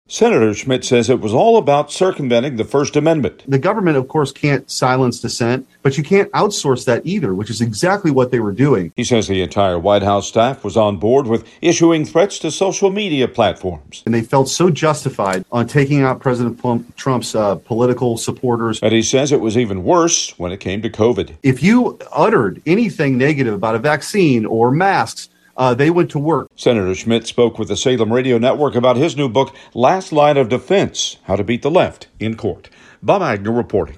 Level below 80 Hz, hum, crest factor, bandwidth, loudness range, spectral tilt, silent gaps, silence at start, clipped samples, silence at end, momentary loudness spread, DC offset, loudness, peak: -48 dBFS; none; 16 dB; 12.5 kHz; 2 LU; -5 dB/octave; none; 0.1 s; under 0.1%; 0 s; 6 LU; under 0.1%; -16 LUFS; 0 dBFS